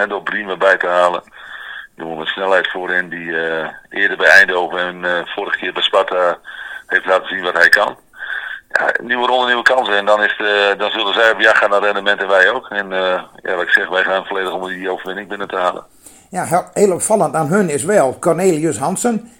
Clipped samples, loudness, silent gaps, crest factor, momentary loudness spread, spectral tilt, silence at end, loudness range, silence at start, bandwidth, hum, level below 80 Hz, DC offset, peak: 0.2%; -15 LUFS; none; 16 dB; 13 LU; -3 dB/octave; 0.1 s; 5 LU; 0 s; 17 kHz; none; -60 dBFS; under 0.1%; 0 dBFS